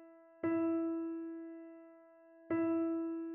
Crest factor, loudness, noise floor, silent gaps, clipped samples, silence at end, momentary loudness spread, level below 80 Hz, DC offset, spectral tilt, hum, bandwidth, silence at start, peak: 14 dB; -37 LUFS; -61 dBFS; none; under 0.1%; 0 s; 17 LU; -84 dBFS; under 0.1%; -8.5 dB/octave; none; 2.8 kHz; 0 s; -24 dBFS